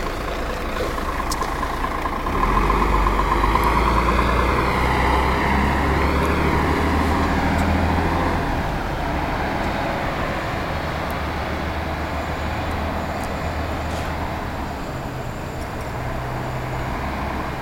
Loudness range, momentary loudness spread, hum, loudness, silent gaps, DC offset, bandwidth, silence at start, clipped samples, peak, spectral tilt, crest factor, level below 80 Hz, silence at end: 8 LU; 8 LU; none; -22 LUFS; none; under 0.1%; 16.5 kHz; 0 s; under 0.1%; -2 dBFS; -6 dB/octave; 18 dB; -28 dBFS; 0 s